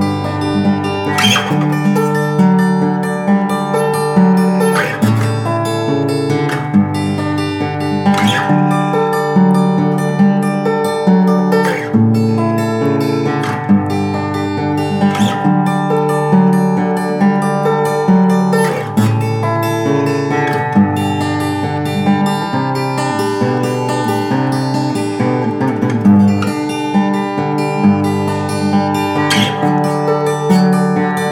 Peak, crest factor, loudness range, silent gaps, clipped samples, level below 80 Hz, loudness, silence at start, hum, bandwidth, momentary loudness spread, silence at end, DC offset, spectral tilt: 0 dBFS; 12 dB; 2 LU; none; under 0.1%; -56 dBFS; -14 LUFS; 0 s; none; 15.5 kHz; 5 LU; 0 s; under 0.1%; -6.5 dB/octave